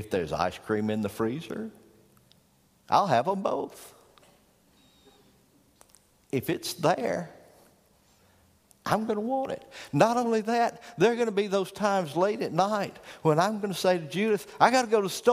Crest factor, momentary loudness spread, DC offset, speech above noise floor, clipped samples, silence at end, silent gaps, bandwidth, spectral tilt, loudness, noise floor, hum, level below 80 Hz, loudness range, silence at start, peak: 24 dB; 11 LU; under 0.1%; 37 dB; under 0.1%; 0 s; none; 15.5 kHz; -5 dB/octave; -27 LUFS; -64 dBFS; none; -64 dBFS; 7 LU; 0 s; -6 dBFS